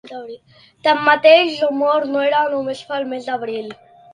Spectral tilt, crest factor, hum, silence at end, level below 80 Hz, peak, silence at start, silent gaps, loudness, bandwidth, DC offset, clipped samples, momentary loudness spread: -4 dB/octave; 18 dB; none; 0.4 s; -68 dBFS; 0 dBFS; 0.05 s; none; -16 LUFS; 10 kHz; under 0.1%; under 0.1%; 20 LU